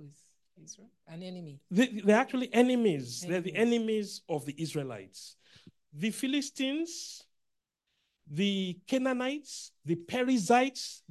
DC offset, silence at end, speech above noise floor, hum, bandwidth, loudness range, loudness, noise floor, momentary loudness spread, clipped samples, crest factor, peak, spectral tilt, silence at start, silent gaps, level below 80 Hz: under 0.1%; 0.15 s; 51 dB; none; 12.5 kHz; 7 LU; -30 LUFS; -82 dBFS; 20 LU; under 0.1%; 22 dB; -10 dBFS; -5 dB/octave; 0 s; none; -78 dBFS